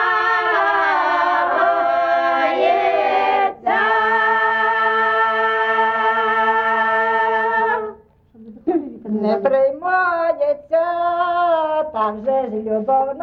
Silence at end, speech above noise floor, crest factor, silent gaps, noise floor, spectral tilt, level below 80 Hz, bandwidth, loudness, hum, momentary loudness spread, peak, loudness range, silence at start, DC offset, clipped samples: 0 s; 26 dB; 12 dB; none; -46 dBFS; -5.5 dB/octave; -58 dBFS; 6.6 kHz; -17 LUFS; none; 5 LU; -6 dBFS; 3 LU; 0 s; under 0.1%; under 0.1%